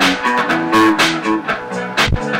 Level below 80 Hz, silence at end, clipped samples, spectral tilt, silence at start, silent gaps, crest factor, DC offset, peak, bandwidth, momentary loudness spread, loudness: -32 dBFS; 0 s; under 0.1%; -4 dB/octave; 0 s; none; 12 dB; under 0.1%; -2 dBFS; 16.5 kHz; 8 LU; -15 LUFS